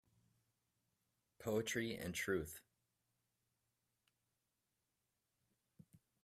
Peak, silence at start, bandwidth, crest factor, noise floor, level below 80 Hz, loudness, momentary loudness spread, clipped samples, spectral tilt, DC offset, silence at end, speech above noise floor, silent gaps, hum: -26 dBFS; 1.4 s; 15.5 kHz; 22 dB; -89 dBFS; -74 dBFS; -43 LUFS; 11 LU; under 0.1%; -4 dB/octave; under 0.1%; 3.65 s; 46 dB; none; none